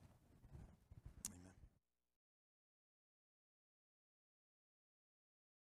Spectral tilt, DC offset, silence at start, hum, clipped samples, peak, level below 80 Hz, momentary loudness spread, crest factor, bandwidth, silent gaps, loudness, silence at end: -3 dB/octave; under 0.1%; 0 s; none; under 0.1%; -28 dBFS; -72 dBFS; 12 LU; 38 dB; 12 kHz; none; -58 LUFS; 4 s